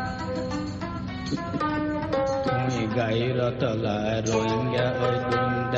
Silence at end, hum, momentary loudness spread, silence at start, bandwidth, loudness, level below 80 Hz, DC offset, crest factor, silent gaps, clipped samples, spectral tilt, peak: 0 s; none; 6 LU; 0 s; 8 kHz; -26 LUFS; -46 dBFS; under 0.1%; 16 dB; none; under 0.1%; -6 dB/octave; -10 dBFS